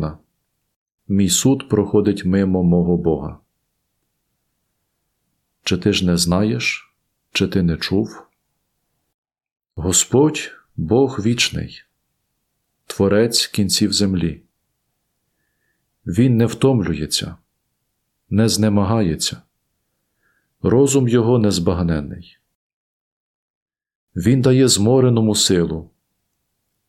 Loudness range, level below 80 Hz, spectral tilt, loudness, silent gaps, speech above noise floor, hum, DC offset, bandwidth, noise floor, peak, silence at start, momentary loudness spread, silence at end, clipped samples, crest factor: 5 LU; -46 dBFS; -5 dB/octave; -17 LUFS; 0.76-0.86 s, 0.94-0.98 s, 9.14-9.23 s, 9.52-9.56 s, 22.55-23.66 s, 23.95-24.07 s; 56 dB; none; under 0.1%; 16 kHz; -72 dBFS; -2 dBFS; 0 s; 14 LU; 1.05 s; under 0.1%; 18 dB